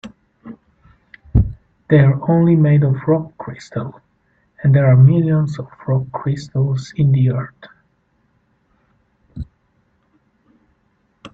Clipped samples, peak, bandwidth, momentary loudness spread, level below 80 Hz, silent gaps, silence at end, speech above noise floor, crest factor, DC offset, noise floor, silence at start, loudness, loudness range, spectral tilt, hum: under 0.1%; 0 dBFS; 7.4 kHz; 20 LU; -36 dBFS; none; 0.05 s; 48 dB; 18 dB; under 0.1%; -62 dBFS; 0.05 s; -16 LUFS; 7 LU; -9.5 dB/octave; none